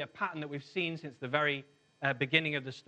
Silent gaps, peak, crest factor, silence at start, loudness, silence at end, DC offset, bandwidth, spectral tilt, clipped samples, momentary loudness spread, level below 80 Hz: none; -10 dBFS; 26 dB; 0 s; -33 LUFS; 0.1 s; under 0.1%; 9.2 kHz; -6 dB/octave; under 0.1%; 10 LU; -78 dBFS